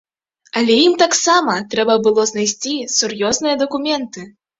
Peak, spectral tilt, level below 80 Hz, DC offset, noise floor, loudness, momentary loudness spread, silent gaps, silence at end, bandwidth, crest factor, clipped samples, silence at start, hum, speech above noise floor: 0 dBFS; -2 dB/octave; -60 dBFS; under 0.1%; -39 dBFS; -16 LUFS; 9 LU; none; 0.3 s; 7.8 kHz; 16 dB; under 0.1%; 0.55 s; none; 23 dB